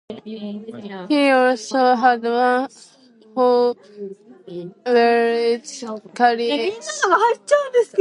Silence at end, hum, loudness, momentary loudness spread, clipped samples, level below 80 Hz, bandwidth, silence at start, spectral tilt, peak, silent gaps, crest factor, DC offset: 0 s; none; -18 LUFS; 18 LU; under 0.1%; -74 dBFS; 11 kHz; 0.1 s; -3.5 dB/octave; -2 dBFS; none; 18 dB; under 0.1%